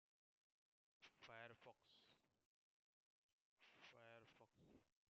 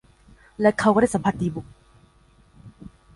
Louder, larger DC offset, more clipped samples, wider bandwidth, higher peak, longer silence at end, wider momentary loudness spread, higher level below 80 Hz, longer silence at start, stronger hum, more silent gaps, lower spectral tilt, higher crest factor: second, -65 LUFS vs -21 LUFS; neither; neither; second, 6.8 kHz vs 11.5 kHz; second, -46 dBFS vs -6 dBFS; about the same, 0.2 s vs 0.3 s; second, 7 LU vs 10 LU; second, under -90 dBFS vs -52 dBFS; first, 1 s vs 0.6 s; neither; first, 2.46-3.57 s vs none; second, -2 dB/octave vs -6.5 dB/octave; first, 26 dB vs 20 dB